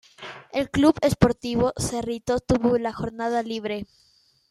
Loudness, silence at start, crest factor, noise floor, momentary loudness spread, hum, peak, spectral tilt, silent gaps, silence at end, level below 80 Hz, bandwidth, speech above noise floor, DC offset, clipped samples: -24 LUFS; 0.2 s; 22 dB; -42 dBFS; 12 LU; none; -2 dBFS; -6 dB/octave; none; 0.65 s; -44 dBFS; 13.5 kHz; 19 dB; under 0.1%; under 0.1%